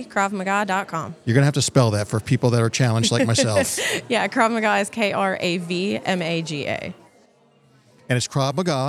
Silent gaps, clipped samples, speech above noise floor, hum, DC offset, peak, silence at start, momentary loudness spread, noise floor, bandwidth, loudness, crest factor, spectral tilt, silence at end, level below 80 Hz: none; under 0.1%; 36 dB; none; under 0.1%; -2 dBFS; 0 s; 7 LU; -57 dBFS; 14.5 kHz; -21 LUFS; 20 dB; -4.5 dB/octave; 0 s; -62 dBFS